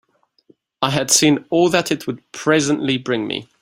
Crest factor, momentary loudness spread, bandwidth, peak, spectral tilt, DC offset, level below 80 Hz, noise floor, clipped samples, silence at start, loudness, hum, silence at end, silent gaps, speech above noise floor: 18 dB; 10 LU; 16 kHz; 0 dBFS; -3.5 dB/octave; under 0.1%; -58 dBFS; -56 dBFS; under 0.1%; 0.8 s; -17 LUFS; none; 0.2 s; none; 38 dB